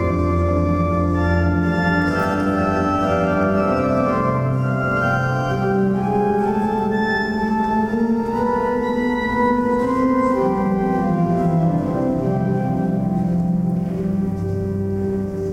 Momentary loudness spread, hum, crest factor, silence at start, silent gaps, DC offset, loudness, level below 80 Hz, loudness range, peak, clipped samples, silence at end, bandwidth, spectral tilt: 3 LU; none; 14 dB; 0 s; none; under 0.1%; -19 LUFS; -36 dBFS; 1 LU; -6 dBFS; under 0.1%; 0 s; 10.5 kHz; -8.5 dB/octave